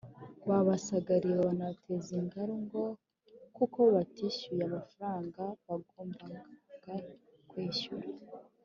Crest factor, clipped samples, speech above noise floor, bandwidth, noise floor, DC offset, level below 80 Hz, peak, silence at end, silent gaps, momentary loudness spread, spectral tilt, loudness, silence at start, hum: 20 dB; under 0.1%; 24 dB; 7.4 kHz; -58 dBFS; under 0.1%; -74 dBFS; -16 dBFS; 0.2 s; none; 20 LU; -6.5 dB/octave; -34 LUFS; 0.05 s; none